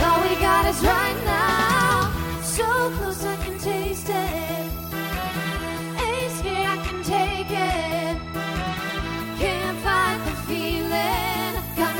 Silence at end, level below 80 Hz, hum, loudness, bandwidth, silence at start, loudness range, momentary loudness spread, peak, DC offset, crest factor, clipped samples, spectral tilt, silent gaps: 0 s; -36 dBFS; none; -23 LUFS; 17.5 kHz; 0 s; 5 LU; 9 LU; -6 dBFS; under 0.1%; 18 dB; under 0.1%; -4 dB/octave; none